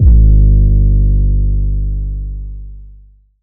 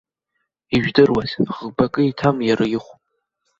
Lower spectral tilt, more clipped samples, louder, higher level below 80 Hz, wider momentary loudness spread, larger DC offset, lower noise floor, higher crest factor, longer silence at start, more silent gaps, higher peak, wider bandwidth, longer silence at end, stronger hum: first, -17 dB/octave vs -7 dB/octave; neither; first, -13 LUFS vs -19 LUFS; first, -12 dBFS vs -48 dBFS; first, 19 LU vs 8 LU; neither; second, -42 dBFS vs -75 dBFS; second, 10 dB vs 20 dB; second, 0 s vs 0.7 s; neither; about the same, 0 dBFS vs 0 dBFS; second, 0.7 kHz vs 7.6 kHz; second, 0 s vs 0.7 s; first, 50 Hz at -15 dBFS vs none